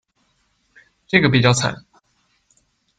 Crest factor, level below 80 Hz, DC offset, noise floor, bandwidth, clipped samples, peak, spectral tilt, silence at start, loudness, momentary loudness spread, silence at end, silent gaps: 20 dB; -52 dBFS; under 0.1%; -65 dBFS; 9.4 kHz; under 0.1%; -2 dBFS; -4.5 dB/octave; 1.15 s; -17 LUFS; 12 LU; 1.25 s; none